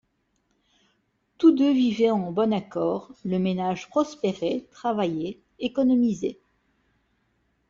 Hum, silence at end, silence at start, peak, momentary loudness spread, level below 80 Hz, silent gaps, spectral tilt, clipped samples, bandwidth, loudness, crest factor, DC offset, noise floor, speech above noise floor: none; 1.35 s; 1.4 s; -6 dBFS; 10 LU; -64 dBFS; none; -7 dB/octave; under 0.1%; 7.4 kHz; -25 LUFS; 18 dB; under 0.1%; -72 dBFS; 48 dB